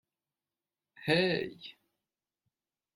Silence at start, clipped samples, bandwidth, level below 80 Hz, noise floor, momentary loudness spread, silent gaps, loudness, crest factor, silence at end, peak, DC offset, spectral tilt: 1 s; under 0.1%; 16 kHz; -72 dBFS; under -90 dBFS; 21 LU; none; -31 LUFS; 24 dB; 1.25 s; -14 dBFS; under 0.1%; -6 dB/octave